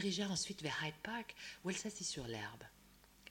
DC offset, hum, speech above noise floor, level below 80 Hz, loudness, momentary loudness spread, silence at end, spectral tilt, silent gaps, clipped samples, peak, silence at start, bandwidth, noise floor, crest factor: under 0.1%; none; 22 dB; -68 dBFS; -43 LUFS; 14 LU; 0 s; -3 dB/octave; none; under 0.1%; -26 dBFS; 0 s; 16.5 kHz; -66 dBFS; 18 dB